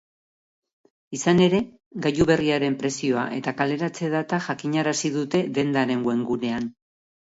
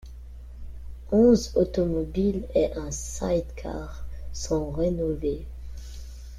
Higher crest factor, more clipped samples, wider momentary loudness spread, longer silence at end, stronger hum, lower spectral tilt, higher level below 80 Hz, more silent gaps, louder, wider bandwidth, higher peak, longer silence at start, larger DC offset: about the same, 18 dB vs 20 dB; neither; second, 8 LU vs 23 LU; first, 0.6 s vs 0 s; neither; about the same, -5.5 dB/octave vs -6.5 dB/octave; second, -54 dBFS vs -38 dBFS; first, 1.86-1.91 s vs none; first, -23 LUFS vs -26 LUFS; second, 8 kHz vs 14.5 kHz; about the same, -6 dBFS vs -8 dBFS; first, 1.1 s vs 0 s; neither